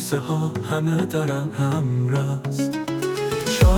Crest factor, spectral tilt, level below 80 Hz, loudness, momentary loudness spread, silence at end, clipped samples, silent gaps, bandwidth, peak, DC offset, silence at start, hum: 16 dB; -6 dB/octave; -30 dBFS; -23 LUFS; 3 LU; 0 s; under 0.1%; none; 19 kHz; -6 dBFS; under 0.1%; 0 s; none